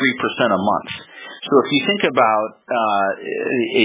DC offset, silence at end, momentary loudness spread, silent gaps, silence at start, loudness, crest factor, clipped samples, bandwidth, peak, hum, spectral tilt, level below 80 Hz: under 0.1%; 0 s; 13 LU; none; 0 s; -18 LUFS; 18 dB; under 0.1%; 4 kHz; 0 dBFS; none; -8.5 dB/octave; -60 dBFS